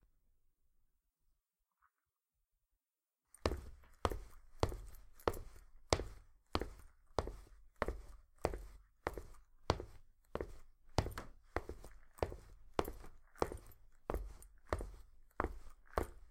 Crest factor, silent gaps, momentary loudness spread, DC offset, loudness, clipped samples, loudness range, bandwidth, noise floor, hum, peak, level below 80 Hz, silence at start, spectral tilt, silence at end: 38 dB; none; 19 LU; under 0.1%; -45 LUFS; under 0.1%; 4 LU; 16.5 kHz; under -90 dBFS; none; -8 dBFS; -52 dBFS; 3.45 s; -5 dB/octave; 0 s